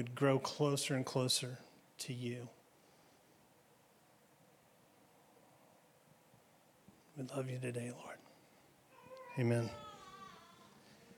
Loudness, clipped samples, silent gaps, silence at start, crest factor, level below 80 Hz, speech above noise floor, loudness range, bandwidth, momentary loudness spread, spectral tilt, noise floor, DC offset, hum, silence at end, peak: -39 LUFS; under 0.1%; none; 0 s; 22 dB; -84 dBFS; 30 dB; 13 LU; 18 kHz; 25 LU; -4.5 dB/octave; -68 dBFS; under 0.1%; none; 0.05 s; -20 dBFS